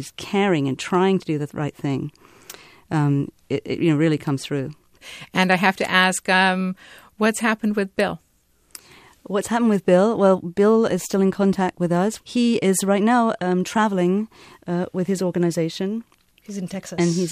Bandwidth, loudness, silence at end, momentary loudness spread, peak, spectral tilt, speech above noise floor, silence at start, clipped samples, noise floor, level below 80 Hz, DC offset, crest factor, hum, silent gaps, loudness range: 14.5 kHz; -21 LUFS; 0 s; 12 LU; -2 dBFS; -5.5 dB/octave; 41 dB; 0 s; under 0.1%; -61 dBFS; -60 dBFS; under 0.1%; 20 dB; none; none; 5 LU